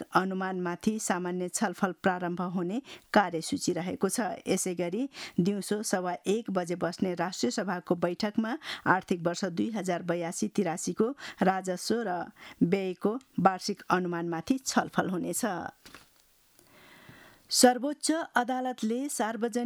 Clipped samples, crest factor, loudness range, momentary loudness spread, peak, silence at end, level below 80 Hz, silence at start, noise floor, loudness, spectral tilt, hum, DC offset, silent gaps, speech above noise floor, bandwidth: under 0.1%; 22 dB; 2 LU; 6 LU; -8 dBFS; 0 s; -70 dBFS; 0 s; -64 dBFS; -30 LUFS; -4.5 dB/octave; none; under 0.1%; none; 34 dB; 19.5 kHz